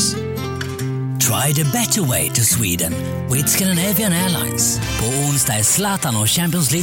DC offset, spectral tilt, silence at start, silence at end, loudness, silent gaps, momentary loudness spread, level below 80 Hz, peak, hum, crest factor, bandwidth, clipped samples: under 0.1%; -3.5 dB/octave; 0 s; 0 s; -17 LUFS; none; 9 LU; -40 dBFS; -4 dBFS; none; 14 dB; 17 kHz; under 0.1%